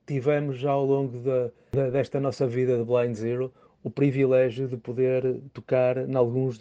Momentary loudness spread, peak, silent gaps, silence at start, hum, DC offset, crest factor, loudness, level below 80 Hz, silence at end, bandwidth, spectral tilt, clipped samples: 8 LU; -8 dBFS; none; 0.1 s; none; under 0.1%; 16 dB; -26 LUFS; -62 dBFS; 0 s; 8 kHz; -8.5 dB/octave; under 0.1%